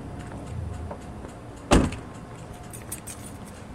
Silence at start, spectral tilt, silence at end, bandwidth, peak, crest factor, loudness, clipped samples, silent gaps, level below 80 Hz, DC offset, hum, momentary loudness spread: 0 s; -5 dB/octave; 0 s; 16 kHz; -4 dBFS; 26 dB; -30 LUFS; under 0.1%; none; -36 dBFS; under 0.1%; none; 19 LU